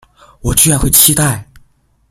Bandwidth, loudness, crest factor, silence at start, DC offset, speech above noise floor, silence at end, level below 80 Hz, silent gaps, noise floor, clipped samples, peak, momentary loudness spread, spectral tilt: over 20 kHz; -9 LUFS; 14 dB; 0.45 s; under 0.1%; 40 dB; 0.7 s; -28 dBFS; none; -51 dBFS; 0.4%; 0 dBFS; 15 LU; -3 dB/octave